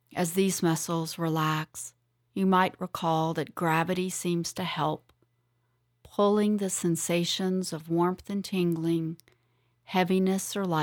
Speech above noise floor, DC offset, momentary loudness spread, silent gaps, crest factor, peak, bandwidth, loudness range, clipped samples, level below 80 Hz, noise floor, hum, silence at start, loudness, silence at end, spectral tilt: 45 dB; under 0.1%; 7 LU; none; 18 dB; -12 dBFS; 19 kHz; 2 LU; under 0.1%; -68 dBFS; -73 dBFS; none; 0.1 s; -28 LUFS; 0 s; -5 dB/octave